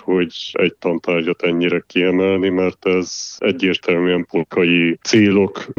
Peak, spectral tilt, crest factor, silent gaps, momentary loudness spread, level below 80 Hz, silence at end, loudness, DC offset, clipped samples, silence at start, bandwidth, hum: -2 dBFS; -5 dB/octave; 14 dB; none; 6 LU; -60 dBFS; 0.05 s; -17 LUFS; under 0.1%; under 0.1%; 0.05 s; 7.4 kHz; none